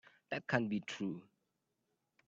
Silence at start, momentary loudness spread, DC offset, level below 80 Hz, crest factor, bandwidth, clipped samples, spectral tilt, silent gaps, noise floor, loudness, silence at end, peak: 0.3 s; 8 LU; under 0.1%; -80 dBFS; 28 dB; 8 kHz; under 0.1%; -6 dB/octave; none; -85 dBFS; -39 LUFS; 1.05 s; -16 dBFS